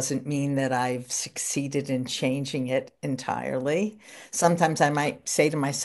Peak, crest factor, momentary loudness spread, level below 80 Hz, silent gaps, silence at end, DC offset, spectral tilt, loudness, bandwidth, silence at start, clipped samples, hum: -6 dBFS; 20 dB; 7 LU; -70 dBFS; none; 0 s; under 0.1%; -4.5 dB/octave; -26 LUFS; 12 kHz; 0 s; under 0.1%; none